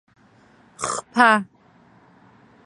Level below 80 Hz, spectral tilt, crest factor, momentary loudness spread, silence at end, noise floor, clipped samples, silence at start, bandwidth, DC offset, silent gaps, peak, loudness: -66 dBFS; -3 dB/octave; 24 dB; 15 LU; 1.2 s; -54 dBFS; under 0.1%; 0.8 s; 11.5 kHz; under 0.1%; none; 0 dBFS; -19 LUFS